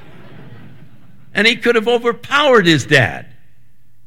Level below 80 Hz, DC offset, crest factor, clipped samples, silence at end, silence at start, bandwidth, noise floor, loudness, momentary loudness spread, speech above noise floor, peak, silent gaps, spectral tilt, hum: -54 dBFS; 2%; 16 dB; under 0.1%; 0.85 s; 0.5 s; 16 kHz; -55 dBFS; -13 LUFS; 9 LU; 42 dB; 0 dBFS; none; -4.5 dB/octave; none